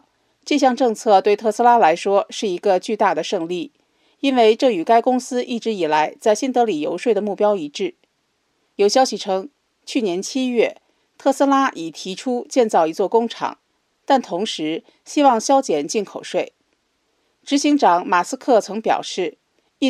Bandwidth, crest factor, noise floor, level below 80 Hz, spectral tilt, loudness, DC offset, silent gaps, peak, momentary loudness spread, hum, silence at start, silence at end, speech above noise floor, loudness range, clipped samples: 14 kHz; 18 dB; -68 dBFS; -78 dBFS; -3.5 dB/octave; -19 LUFS; under 0.1%; none; 0 dBFS; 11 LU; none; 0.45 s; 0 s; 50 dB; 4 LU; under 0.1%